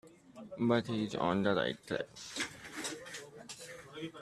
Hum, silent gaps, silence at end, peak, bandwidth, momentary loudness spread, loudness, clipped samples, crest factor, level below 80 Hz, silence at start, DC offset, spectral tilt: none; none; 0 s; -16 dBFS; 13.5 kHz; 17 LU; -36 LUFS; under 0.1%; 20 dB; -70 dBFS; 0.05 s; under 0.1%; -4.5 dB/octave